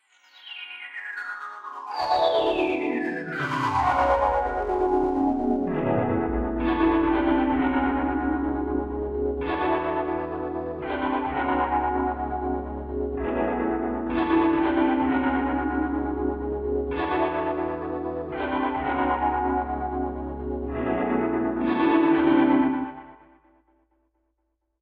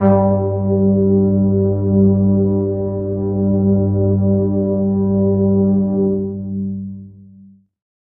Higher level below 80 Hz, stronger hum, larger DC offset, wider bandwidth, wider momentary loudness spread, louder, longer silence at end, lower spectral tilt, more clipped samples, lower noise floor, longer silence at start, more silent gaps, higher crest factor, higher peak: about the same, -40 dBFS vs -44 dBFS; neither; neither; first, 7.4 kHz vs 2.3 kHz; about the same, 10 LU vs 10 LU; second, -25 LUFS vs -16 LUFS; first, 1.65 s vs 0.8 s; second, -7.5 dB/octave vs -14.5 dB/octave; neither; first, -76 dBFS vs -45 dBFS; first, 0.45 s vs 0 s; neither; about the same, 16 dB vs 14 dB; second, -8 dBFS vs -2 dBFS